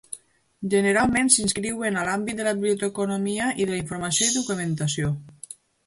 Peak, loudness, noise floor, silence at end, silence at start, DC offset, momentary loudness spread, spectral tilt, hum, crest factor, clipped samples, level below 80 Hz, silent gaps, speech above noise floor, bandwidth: -4 dBFS; -23 LUFS; -45 dBFS; 0.35 s; 0.1 s; under 0.1%; 15 LU; -3.5 dB/octave; none; 22 dB; under 0.1%; -54 dBFS; none; 21 dB; 11.5 kHz